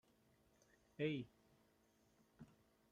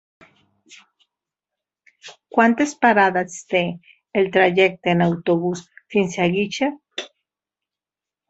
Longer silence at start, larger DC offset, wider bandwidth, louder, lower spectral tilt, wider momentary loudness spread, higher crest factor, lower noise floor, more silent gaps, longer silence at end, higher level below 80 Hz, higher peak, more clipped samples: first, 1 s vs 0.7 s; neither; first, 15 kHz vs 8.2 kHz; second, -46 LUFS vs -19 LUFS; first, -7 dB/octave vs -5.5 dB/octave; first, 22 LU vs 17 LU; about the same, 22 dB vs 20 dB; second, -77 dBFS vs -89 dBFS; neither; second, 0.45 s vs 1.25 s; second, -84 dBFS vs -62 dBFS; second, -30 dBFS vs -2 dBFS; neither